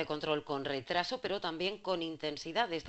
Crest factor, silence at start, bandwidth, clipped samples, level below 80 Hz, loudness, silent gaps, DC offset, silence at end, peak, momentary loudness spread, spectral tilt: 20 dB; 0 s; 8.2 kHz; under 0.1%; -66 dBFS; -36 LUFS; none; under 0.1%; 0 s; -16 dBFS; 3 LU; -4.5 dB/octave